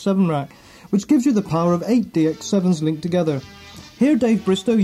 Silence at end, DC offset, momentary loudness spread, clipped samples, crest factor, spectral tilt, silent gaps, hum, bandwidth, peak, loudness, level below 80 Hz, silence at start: 0 s; under 0.1%; 11 LU; under 0.1%; 12 dB; -7 dB/octave; none; none; 13.5 kHz; -6 dBFS; -19 LUFS; -54 dBFS; 0 s